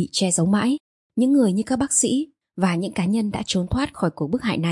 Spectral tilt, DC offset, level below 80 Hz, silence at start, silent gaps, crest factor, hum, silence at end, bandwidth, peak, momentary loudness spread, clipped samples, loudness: -4.5 dB/octave; under 0.1%; -48 dBFS; 0 s; 0.80-1.10 s; 16 dB; none; 0 s; 11.5 kHz; -6 dBFS; 7 LU; under 0.1%; -22 LUFS